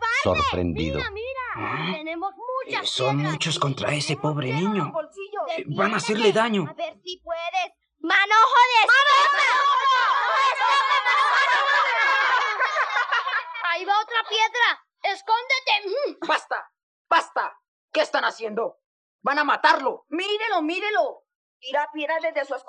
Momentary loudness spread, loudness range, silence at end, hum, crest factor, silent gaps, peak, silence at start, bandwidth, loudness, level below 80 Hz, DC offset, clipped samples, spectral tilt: 13 LU; 8 LU; 0.1 s; none; 18 dB; 16.83-17.05 s, 17.68-17.88 s, 18.86-19.19 s, 21.35-21.60 s; -4 dBFS; 0 s; 11 kHz; -22 LUFS; -54 dBFS; under 0.1%; under 0.1%; -4 dB/octave